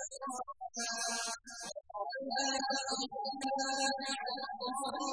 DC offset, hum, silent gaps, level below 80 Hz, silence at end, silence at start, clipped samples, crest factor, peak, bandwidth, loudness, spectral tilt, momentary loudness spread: under 0.1%; none; none; -76 dBFS; 0 s; 0 s; under 0.1%; 16 dB; -22 dBFS; 10.5 kHz; -37 LUFS; 0 dB/octave; 9 LU